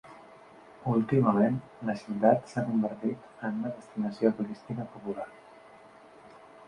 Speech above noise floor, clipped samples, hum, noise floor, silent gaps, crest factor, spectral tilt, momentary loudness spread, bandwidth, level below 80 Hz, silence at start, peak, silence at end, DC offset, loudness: 24 dB; under 0.1%; none; -53 dBFS; none; 22 dB; -9 dB/octave; 13 LU; 10 kHz; -68 dBFS; 0.05 s; -8 dBFS; 0.05 s; under 0.1%; -30 LUFS